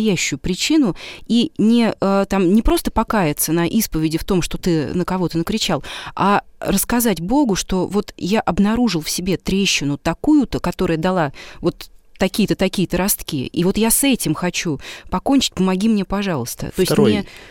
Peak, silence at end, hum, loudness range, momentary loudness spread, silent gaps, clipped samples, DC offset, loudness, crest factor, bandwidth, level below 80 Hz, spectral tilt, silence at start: -4 dBFS; 0 s; none; 2 LU; 7 LU; none; under 0.1%; 0.2%; -18 LUFS; 14 dB; 18 kHz; -34 dBFS; -4.5 dB/octave; 0 s